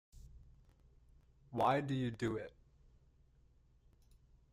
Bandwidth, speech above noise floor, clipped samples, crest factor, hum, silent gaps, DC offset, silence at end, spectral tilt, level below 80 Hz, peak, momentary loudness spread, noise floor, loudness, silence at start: 15 kHz; 32 dB; under 0.1%; 22 dB; none; none; under 0.1%; 2.05 s; -7 dB/octave; -64 dBFS; -22 dBFS; 12 LU; -69 dBFS; -38 LUFS; 0.15 s